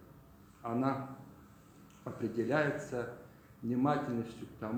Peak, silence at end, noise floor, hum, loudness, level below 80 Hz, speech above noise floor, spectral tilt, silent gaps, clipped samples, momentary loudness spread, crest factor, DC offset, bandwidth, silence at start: -16 dBFS; 0 s; -58 dBFS; none; -36 LUFS; -68 dBFS; 23 dB; -7.5 dB/octave; none; under 0.1%; 19 LU; 22 dB; under 0.1%; 19.5 kHz; 0 s